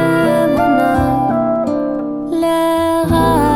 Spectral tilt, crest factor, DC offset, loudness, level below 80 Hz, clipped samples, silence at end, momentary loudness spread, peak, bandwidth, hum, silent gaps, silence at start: -6.5 dB/octave; 12 dB; under 0.1%; -14 LUFS; -34 dBFS; under 0.1%; 0 s; 6 LU; 0 dBFS; 17 kHz; none; none; 0 s